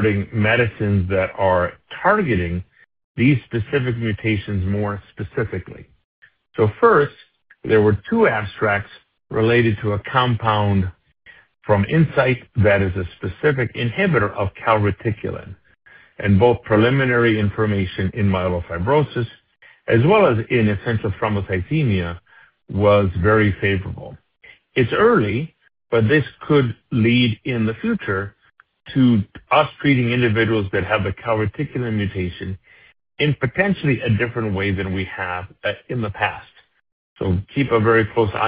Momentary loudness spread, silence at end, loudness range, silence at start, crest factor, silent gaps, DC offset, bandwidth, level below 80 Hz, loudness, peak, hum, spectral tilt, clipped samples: 11 LU; 0 s; 4 LU; 0 s; 18 dB; 3.04-3.15 s, 6.04-6.22 s, 36.92-37.16 s; under 0.1%; 5 kHz; -44 dBFS; -19 LUFS; -2 dBFS; none; -11.5 dB/octave; under 0.1%